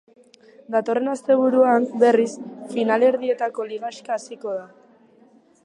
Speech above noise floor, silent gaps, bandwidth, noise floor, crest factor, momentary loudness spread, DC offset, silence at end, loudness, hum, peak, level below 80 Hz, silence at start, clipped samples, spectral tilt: 34 dB; none; 11 kHz; -54 dBFS; 18 dB; 13 LU; under 0.1%; 1 s; -21 LUFS; none; -4 dBFS; -78 dBFS; 0.7 s; under 0.1%; -5 dB/octave